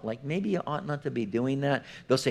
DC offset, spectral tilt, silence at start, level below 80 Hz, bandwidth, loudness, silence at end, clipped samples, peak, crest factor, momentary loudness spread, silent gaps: under 0.1%; -6 dB/octave; 0 s; -68 dBFS; 13.5 kHz; -30 LUFS; 0 s; under 0.1%; -12 dBFS; 18 dB; 5 LU; none